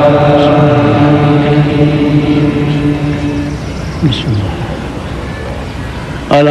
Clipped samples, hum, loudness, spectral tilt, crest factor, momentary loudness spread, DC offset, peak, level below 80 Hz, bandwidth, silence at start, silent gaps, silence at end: 0.6%; none; -11 LUFS; -7.5 dB/octave; 10 dB; 13 LU; under 0.1%; 0 dBFS; -28 dBFS; 11 kHz; 0 s; none; 0 s